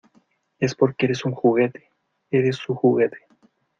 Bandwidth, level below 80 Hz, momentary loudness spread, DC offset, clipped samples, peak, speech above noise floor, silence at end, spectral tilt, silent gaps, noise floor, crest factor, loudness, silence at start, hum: 7.4 kHz; -64 dBFS; 6 LU; under 0.1%; under 0.1%; -4 dBFS; 42 dB; 0.65 s; -7 dB/octave; none; -62 dBFS; 20 dB; -22 LUFS; 0.6 s; none